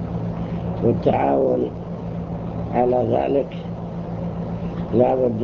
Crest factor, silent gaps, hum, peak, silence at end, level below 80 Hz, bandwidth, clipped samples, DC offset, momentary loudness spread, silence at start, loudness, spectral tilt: 18 dB; none; none; -4 dBFS; 0 s; -40 dBFS; 6.6 kHz; under 0.1%; under 0.1%; 11 LU; 0 s; -22 LUFS; -10 dB/octave